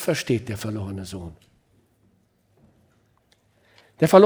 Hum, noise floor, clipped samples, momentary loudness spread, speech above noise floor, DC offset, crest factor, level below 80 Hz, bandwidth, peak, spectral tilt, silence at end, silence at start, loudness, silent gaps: none; -64 dBFS; under 0.1%; 16 LU; 44 dB; under 0.1%; 22 dB; -60 dBFS; over 20 kHz; -2 dBFS; -6 dB/octave; 0 s; 0 s; -25 LUFS; none